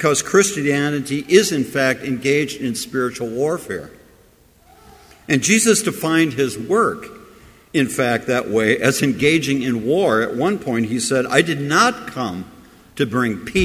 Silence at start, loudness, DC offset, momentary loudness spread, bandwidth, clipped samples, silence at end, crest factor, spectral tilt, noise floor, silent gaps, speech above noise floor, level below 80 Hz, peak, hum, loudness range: 0 s; -18 LUFS; under 0.1%; 10 LU; 16 kHz; under 0.1%; 0 s; 18 dB; -4 dB/octave; -52 dBFS; none; 34 dB; -48 dBFS; 0 dBFS; none; 4 LU